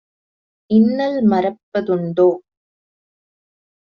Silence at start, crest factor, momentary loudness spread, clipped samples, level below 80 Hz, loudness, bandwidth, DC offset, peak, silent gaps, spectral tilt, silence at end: 0.7 s; 16 dB; 7 LU; under 0.1%; -62 dBFS; -17 LUFS; 5.8 kHz; under 0.1%; -4 dBFS; 1.63-1.72 s; -7 dB/octave; 1.55 s